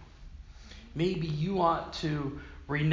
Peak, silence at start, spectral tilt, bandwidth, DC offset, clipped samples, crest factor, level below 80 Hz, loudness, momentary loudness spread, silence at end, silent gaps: -12 dBFS; 0 s; -7 dB/octave; 7.6 kHz; under 0.1%; under 0.1%; 20 dB; -48 dBFS; -31 LUFS; 23 LU; 0 s; none